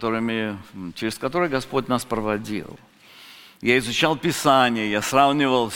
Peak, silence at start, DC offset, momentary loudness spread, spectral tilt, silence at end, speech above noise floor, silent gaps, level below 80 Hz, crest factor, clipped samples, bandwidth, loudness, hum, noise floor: -2 dBFS; 0 s; under 0.1%; 13 LU; -4.5 dB/octave; 0 s; 25 dB; none; -52 dBFS; 20 dB; under 0.1%; 17 kHz; -22 LUFS; none; -47 dBFS